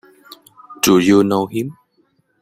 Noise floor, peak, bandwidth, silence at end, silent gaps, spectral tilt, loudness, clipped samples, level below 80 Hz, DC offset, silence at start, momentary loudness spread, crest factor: -61 dBFS; -2 dBFS; 16 kHz; 0.7 s; none; -5 dB/octave; -15 LUFS; under 0.1%; -56 dBFS; under 0.1%; 0.7 s; 13 LU; 16 dB